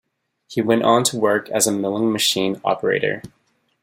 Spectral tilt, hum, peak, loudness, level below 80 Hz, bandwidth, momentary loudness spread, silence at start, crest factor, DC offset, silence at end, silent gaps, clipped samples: -3 dB/octave; none; -2 dBFS; -19 LUFS; -62 dBFS; 16.5 kHz; 8 LU; 0.5 s; 18 dB; under 0.1%; 0.55 s; none; under 0.1%